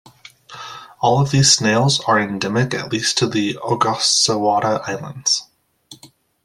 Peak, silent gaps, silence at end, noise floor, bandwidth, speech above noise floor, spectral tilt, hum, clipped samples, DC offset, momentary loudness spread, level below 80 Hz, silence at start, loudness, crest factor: 0 dBFS; none; 0.4 s; -48 dBFS; 13.5 kHz; 31 dB; -3.5 dB/octave; none; under 0.1%; under 0.1%; 10 LU; -54 dBFS; 0.5 s; -17 LUFS; 18 dB